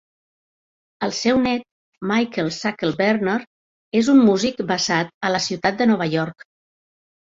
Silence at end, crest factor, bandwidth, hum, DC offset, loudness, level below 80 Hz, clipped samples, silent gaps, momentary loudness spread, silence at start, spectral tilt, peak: 0.95 s; 16 dB; 7.8 kHz; none; under 0.1%; -20 LUFS; -58 dBFS; under 0.1%; 1.71-1.92 s, 3.47-3.91 s, 5.14-5.21 s; 10 LU; 1 s; -4.5 dB/octave; -4 dBFS